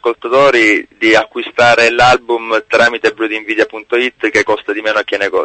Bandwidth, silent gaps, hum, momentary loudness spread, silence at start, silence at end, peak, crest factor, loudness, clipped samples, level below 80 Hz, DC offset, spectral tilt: 9 kHz; none; none; 7 LU; 0 s; 0 s; 0 dBFS; 12 dB; -12 LUFS; under 0.1%; -46 dBFS; under 0.1%; -3.5 dB/octave